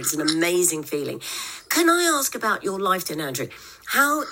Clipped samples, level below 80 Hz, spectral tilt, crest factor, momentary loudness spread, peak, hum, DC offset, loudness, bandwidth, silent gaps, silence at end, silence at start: under 0.1%; -64 dBFS; -2 dB/octave; 18 dB; 11 LU; -4 dBFS; none; under 0.1%; -22 LUFS; 17 kHz; none; 0 s; 0 s